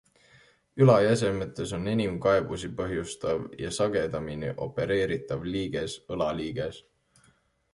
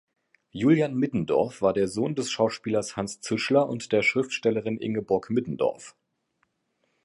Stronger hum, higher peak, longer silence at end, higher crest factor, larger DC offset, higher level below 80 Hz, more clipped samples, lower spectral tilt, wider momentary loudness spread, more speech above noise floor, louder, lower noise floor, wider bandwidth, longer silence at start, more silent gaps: neither; about the same, -6 dBFS vs -8 dBFS; second, 0.95 s vs 1.15 s; about the same, 22 dB vs 18 dB; neither; first, -52 dBFS vs -62 dBFS; neither; about the same, -6 dB/octave vs -5.5 dB/octave; first, 12 LU vs 7 LU; second, 38 dB vs 49 dB; about the same, -28 LUFS vs -26 LUFS; second, -65 dBFS vs -74 dBFS; about the same, 11.5 kHz vs 11.5 kHz; first, 0.75 s vs 0.55 s; neither